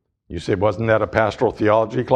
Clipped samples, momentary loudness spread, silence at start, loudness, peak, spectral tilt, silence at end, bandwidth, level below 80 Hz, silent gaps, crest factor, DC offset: under 0.1%; 9 LU; 0.3 s; -19 LUFS; 0 dBFS; -7 dB/octave; 0 s; 9.6 kHz; -44 dBFS; none; 18 dB; under 0.1%